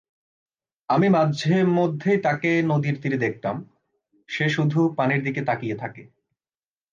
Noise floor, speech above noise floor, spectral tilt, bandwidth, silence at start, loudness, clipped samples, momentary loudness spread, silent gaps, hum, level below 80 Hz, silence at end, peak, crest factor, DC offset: under -90 dBFS; over 68 dB; -7.5 dB/octave; 7.4 kHz; 0.9 s; -22 LUFS; under 0.1%; 11 LU; none; none; -68 dBFS; 0.9 s; -8 dBFS; 16 dB; under 0.1%